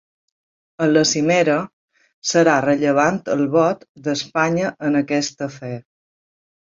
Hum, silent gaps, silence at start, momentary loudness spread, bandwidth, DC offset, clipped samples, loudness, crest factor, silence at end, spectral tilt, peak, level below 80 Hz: none; 1.73-1.88 s, 2.14-2.22 s, 3.89-3.95 s; 0.8 s; 12 LU; 7.8 kHz; under 0.1%; under 0.1%; -18 LUFS; 18 dB; 0.9 s; -4.5 dB/octave; -2 dBFS; -62 dBFS